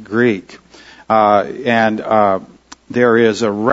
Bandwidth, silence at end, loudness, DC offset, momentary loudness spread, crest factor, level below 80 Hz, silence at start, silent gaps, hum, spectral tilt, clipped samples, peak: 8 kHz; 0 s; -14 LUFS; under 0.1%; 7 LU; 14 dB; -56 dBFS; 0 s; none; none; -6 dB/octave; under 0.1%; 0 dBFS